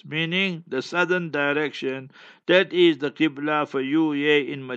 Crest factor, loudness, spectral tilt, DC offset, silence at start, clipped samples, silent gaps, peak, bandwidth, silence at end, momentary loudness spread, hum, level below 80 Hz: 20 dB; -22 LUFS; -6 dB/octave; under 0.1%; 0.05 s; under 0.1%; none; -4 dBFS; 7.8 kHz; 0 s; 10 LU; none; -80 dBFS